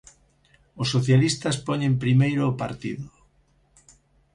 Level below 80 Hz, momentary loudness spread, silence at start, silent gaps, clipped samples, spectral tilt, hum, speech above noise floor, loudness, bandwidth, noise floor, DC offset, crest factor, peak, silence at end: -54 dBFS; 13 LU; 0.75 s; none; under 0.1%; -6 dB/octave; none; 40 dB; -23 LUFS; 11 kHz; -63 dBFS; under 0.1%; 18 dB; -8 dBFS; 1.3 s